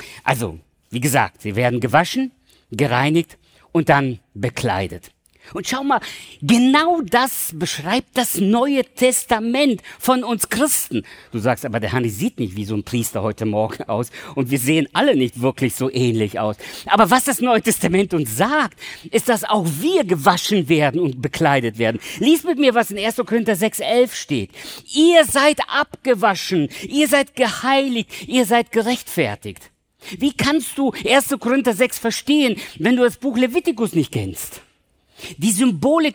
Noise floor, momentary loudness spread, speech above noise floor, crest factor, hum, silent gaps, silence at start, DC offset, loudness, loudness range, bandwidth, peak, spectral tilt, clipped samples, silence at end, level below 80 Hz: -60 dBFS; 9 LU; 42 dB; 18 dB; none; none; 0 s; under 0.1%; -18 LUFS; 4 LU; over 20 kHz; -2 dBFS; -4.5 dB/octave; under 0.1%; 0 s; -54 dBFS